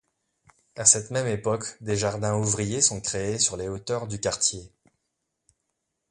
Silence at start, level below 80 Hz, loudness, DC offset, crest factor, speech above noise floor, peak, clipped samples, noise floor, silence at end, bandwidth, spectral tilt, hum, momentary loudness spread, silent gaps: 0.75 s; -54 dBFS; -24 LUFS; under 0.1%; 26 dB; 54 dB; -2 dBFS; under 0.1%; -80 dBFS; 1.45 s; 11.5 kHz; -3 dB/octave; none; 12 LU; none